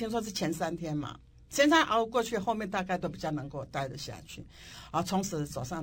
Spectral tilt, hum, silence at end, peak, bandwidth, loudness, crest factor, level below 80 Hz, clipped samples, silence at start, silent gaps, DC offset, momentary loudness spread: -4.5 dB/octave; none; 0 s; -12 dBFS; 17 kHz; -31 LUFS; 20 dB; -56 dBFS; under 0.1%; 0 s; none; under 0.1%; 18 LU